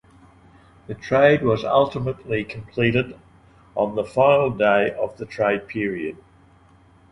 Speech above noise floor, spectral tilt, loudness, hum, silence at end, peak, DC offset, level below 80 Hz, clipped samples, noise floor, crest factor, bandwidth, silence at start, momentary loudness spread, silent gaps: 32 dB; -7.5 dB/octave; -21 LUFS; none; 1 s; -2 dBFS; under 0.1%; -52 dBFS; under 0.1%; -53 dBFS; 20 dB; 10.5 kHz; 0.9 s; 14 LU; none